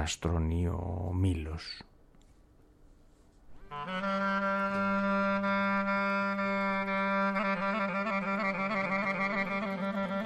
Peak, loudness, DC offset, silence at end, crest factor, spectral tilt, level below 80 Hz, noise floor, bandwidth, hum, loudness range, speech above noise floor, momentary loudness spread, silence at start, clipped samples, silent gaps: -20 dBFS; -31 LUFS; under 0.1%; 0 s; 12 dB; -6 dB/octave; -48 dBFS; -60 dBFS; 11.5 kHz; none; 8 LU; 28 dB; 7 LU; 0 s; under 0.1%; none